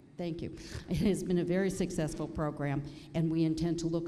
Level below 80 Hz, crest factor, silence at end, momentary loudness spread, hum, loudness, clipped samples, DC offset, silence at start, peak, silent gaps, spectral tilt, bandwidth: -50 dBFS; 14 dB; 0 s; 9 LU; none; -33 LUFS; under 0.1%; under 0.1%; 0.15 s; -18 dBFS; none; -6.5 dB/octave; 13.5 kHz